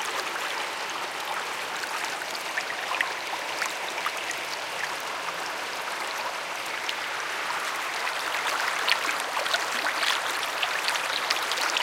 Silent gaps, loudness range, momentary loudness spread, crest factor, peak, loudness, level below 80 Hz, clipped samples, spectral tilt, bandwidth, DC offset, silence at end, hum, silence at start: none; 5 LU; 6 LU; 26 dB; -4 dBFS; -28 LUFS; -76 dBFS; under 0.1%; 0.5 dB/octave; 17 kHz; under 0.1%; 0 s; none; 0 s